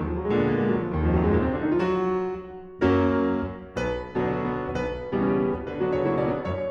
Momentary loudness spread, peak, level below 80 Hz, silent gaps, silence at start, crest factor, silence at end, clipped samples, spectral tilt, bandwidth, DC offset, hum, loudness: 8 LU; -8 dBFS; -40 dBFS; none; 0 s; 16 dB; 0 s; under 0.1%; -8.5 dB/octave; 7.2 kHz; under 0.1%; none; -25 LUFS